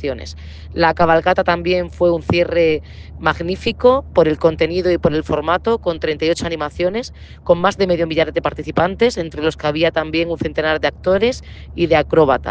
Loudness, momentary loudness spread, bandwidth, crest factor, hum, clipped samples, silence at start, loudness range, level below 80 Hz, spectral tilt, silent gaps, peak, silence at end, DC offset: -17 LUFS; 9 LU; 9 kHz; 16 dB; none; under 0.1%; 0 s; 2 LU; -38 dBFS; -6 dB/octave; none; 0 dBFS; 0 s; under 0.1%